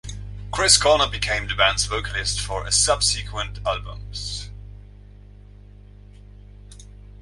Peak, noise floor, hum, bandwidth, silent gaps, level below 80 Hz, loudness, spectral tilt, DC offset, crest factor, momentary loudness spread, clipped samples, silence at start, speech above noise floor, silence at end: 0 dBFS; -44 dBFS; 50 Hz at -35 dBFS; 11.5 kHz; none; -36 dBFS; -20 LUFS; -1 dB/octave; under 0.1%; 24 dB; 18 LU; under 0.1%; 0.05 s; 22 dB; 0 s